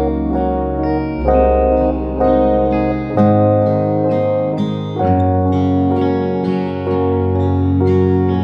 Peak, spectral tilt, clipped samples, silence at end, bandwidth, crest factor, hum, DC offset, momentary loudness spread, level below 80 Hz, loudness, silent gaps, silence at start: -2 dBFS; -10.5 dB/octave; under 0.1%; 0 s; 6 kHz; 12 dB; none; under 0.1%; 5 LU; -28 dBFS; -15 LUFS; none; 0 s